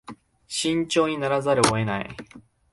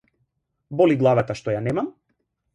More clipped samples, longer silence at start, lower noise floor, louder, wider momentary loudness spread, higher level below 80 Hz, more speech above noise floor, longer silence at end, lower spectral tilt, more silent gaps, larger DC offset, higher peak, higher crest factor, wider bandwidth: neither; second, 0.1 s vs 0.7 s; second, -44 dBFS vs -73 dBFS; about the same, -23 LUFS vs -21 LUFS; about the same, 12 LU vs 13 LU; about the same, -54 dBFS vs -56 dBFS; second, 21 dB vs 53 dB; second, 0.3 s vs 0.65 s; second, -4 dB/octave vs -8 dB/octave; neither; neither; about the same, -4 dBFS vs -6 dBFS; about the same, 22 dB vs 18 dB; about the same, 11.5 kHz vs 11 kHz